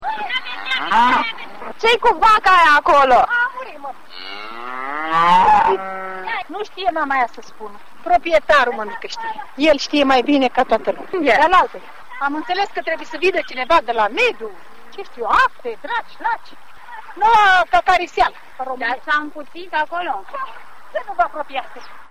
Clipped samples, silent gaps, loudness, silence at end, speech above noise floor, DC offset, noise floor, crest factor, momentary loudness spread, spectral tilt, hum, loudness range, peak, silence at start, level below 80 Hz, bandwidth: under 0.1%; none; -17 LUFS; 0 s; 20 dB; 2%; -37 dBFS; 16 dB; 20 LU; -3.5 dB/octave; none; 6 LU; -2 dBFS; 0 s; -46 dBFS; 15 kHz